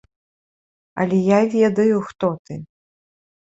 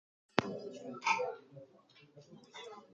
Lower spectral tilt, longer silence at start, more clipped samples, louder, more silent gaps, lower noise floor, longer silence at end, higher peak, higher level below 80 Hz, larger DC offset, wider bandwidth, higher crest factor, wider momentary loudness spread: first, -7.5 dB/octave vs -4 dB/octave; first, 0.95 s vs 0.35 s; neither; first, -18 LUFS vs -37 LUFS; first, 2.39-2.45 s vs none; first, under -90 dBFS vs -64 dBFS; first, 0.8 s vs 0 s; about the same, -4 dBFS vs -6 dBFS; first, -60 dBFS vs -78 dBFS; neither; second, 8 kHz vs 9 kHz; second, 18 dB vs 34 dB; second, 19 LU vs 24 LU